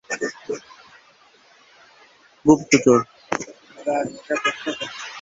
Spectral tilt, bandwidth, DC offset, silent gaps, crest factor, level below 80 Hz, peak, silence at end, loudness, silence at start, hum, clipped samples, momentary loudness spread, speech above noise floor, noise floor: -4.5 dB/octave; 8 kHz; under 0.1%; none; 22 dB; -60 dBFS; -2 dBFS; 0 s; -22 LUFS; 0.1 s; none; under 0.1%; 16 LU; 35 dB; -54 dBFS